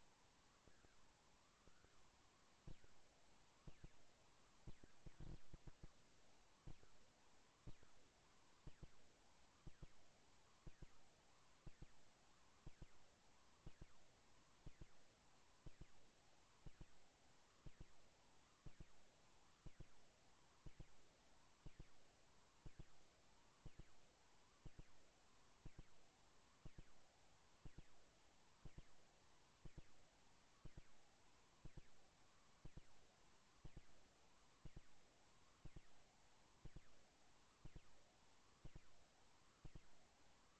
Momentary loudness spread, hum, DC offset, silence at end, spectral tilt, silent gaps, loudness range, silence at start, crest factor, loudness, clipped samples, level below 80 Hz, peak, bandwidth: 2 LU; none; under 0.1%; 0 s; -4.5 dB/octave; none; 0 LU; 0 s; 16 dB; -68 LUFS; under 0.1%; -70 dBFS; -46 dBFS; 8.4 kHz